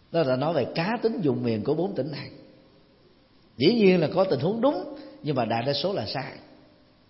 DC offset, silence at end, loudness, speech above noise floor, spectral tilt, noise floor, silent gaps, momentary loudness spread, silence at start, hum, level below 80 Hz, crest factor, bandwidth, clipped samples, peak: under 0.1%; 0.65 s; -25 LUFS; 33 dB; -10 dB/octave; -58 dBFS; none; 13 LU; 0.1 s; none; -64 dBFS; 18 dB; 5.8 kHz; under 0.1%; -8 dBFS